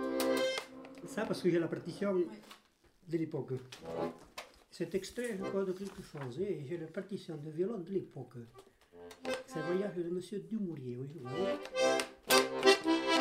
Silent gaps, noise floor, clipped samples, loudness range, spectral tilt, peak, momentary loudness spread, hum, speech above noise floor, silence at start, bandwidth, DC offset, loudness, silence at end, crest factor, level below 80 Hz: none; -55 dBFS; under 0.1%; 8 LU; -4 dB/octave; -12 dBFS; 19 LU; none; 17 dB; 0 s; 16 kHz; under 0.1%; -36 LUFS; 0 s; 24 dB; -72 dBFS